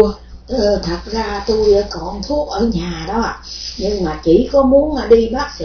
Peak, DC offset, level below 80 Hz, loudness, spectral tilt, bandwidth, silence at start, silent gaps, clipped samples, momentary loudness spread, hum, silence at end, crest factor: 0 dBFS; under 0.1%; -30 dBFS; -16 LUFS; -6 dB/octave; 5.4 kHz; 0 s; none; 0.1%; 11 LU; none; 0 s; 16 dB